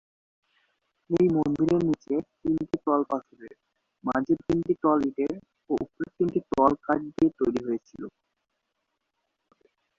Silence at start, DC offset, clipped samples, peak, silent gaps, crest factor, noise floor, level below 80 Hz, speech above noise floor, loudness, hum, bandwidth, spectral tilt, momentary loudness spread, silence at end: 1.1 s; under 0.1%; under 0.1%; -6 dBFS; none; 22 dB; -80 dBFS; -58 dBFS; 54 dB; -27 LUFS; none; 7.2 kHz; -8.5 dB/octave; 10 LU; 1.9 s